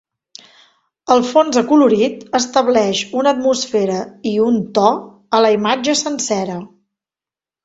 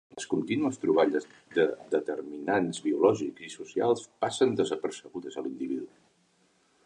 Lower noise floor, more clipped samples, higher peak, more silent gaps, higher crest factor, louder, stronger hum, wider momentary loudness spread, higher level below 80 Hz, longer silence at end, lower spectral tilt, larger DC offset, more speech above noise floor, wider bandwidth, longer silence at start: first, under -90 dBFS vs -68 dBFS; neither; first, 0 dBFS vs -10 dBFS; neither; about the same, 16 dB vs 20 dB; first, -15 LUFS vs -29 LUFS; neither; second, 8 LU vs 12 LU; first, -60 dBFS vs -74 dBFS; about the same, 1 s vs 1 s; about the same, -4 dB/octave vs -5 dB/octave; neither; first, over 75 dB vs 39 dB; second, 8 kHz vs 10.5 kHz; first, 1.1 s vs 0.15 s